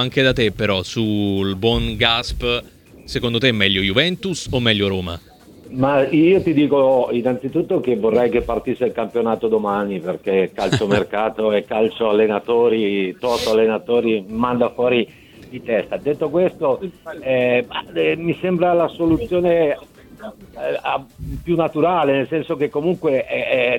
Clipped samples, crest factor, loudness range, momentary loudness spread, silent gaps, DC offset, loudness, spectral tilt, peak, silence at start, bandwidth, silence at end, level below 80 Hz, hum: under 0.1%; 18 dB; 3 LU; 9 LU; none; under 0.1%; -19 LUFS; -6 dB/octave; 0 dBFS; 0 s; 17 kHz; 0 s; -40 dBFS; none